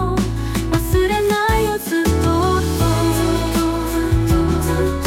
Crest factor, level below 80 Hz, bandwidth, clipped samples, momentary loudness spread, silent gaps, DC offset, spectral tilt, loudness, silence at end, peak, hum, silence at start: 12 dB; -26 dBFS; 17 kHz; under 0.1%; 3 LU; none; under 0.1%; -6 dB/octave; -18 LUFS; 0 s; -4 dBFS; none; 0 s